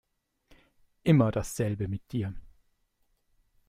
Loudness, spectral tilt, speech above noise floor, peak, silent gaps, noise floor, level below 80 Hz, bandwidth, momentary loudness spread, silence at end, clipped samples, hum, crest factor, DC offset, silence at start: -29 LUFS; -7 dB/octave; 46 dB; -10 dBFS; none; -73 dBFS; -54 dBFS; 15.5 kHz; 12 LU; 1.2 s; under 0.1%; none; 22 dB; under 0.1%; 1.05 s